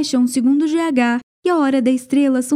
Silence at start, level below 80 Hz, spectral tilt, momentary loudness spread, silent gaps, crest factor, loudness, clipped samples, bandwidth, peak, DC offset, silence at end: 0 s; -70 dBFS; -4 dB/octave; 4 LU; 1.23-1.42 s; 12 dB; -17 LUFS; under 0.1%; 15 kHz; -4 dBFS; under 0.1%; 0 s